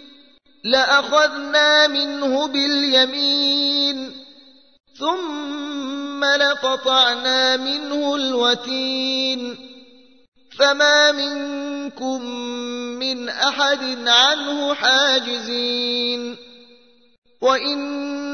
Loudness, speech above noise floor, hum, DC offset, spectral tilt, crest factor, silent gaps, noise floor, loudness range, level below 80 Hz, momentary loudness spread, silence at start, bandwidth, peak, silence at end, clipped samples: -18 LUFS; 34 dB; none; 0.1%; -0.5 dB/octave; 18 dB; 10.28-10.32 s, 17.18-17.22 s; -53 dBFS; 5 LU; -68 dBFS; 13 LU; 0 s; 6.6 kHz; -2 dBFS; 0 s; under 0.1%